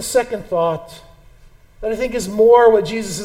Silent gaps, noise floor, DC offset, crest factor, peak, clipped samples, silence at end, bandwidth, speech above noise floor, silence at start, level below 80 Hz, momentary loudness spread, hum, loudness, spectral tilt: none; -46 dBFS; under 0.1%; 16 dB; 0 dBFS; under 0.1%; 0 s; 16 kHz; 30 dB; 0 s; -44 dBFS; 15 LU; none; -16 LUFS; -4 dB/octave